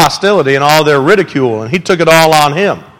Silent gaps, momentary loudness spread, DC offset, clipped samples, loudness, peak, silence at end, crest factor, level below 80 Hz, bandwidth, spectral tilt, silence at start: none; 7 LU; under 0.1%; 0.7%; -9 LUFS; 0 dBFS; 0.15 s; 10 dB; -44 dBFS; over 20 kHz; -4.5 dB/octave; 0 s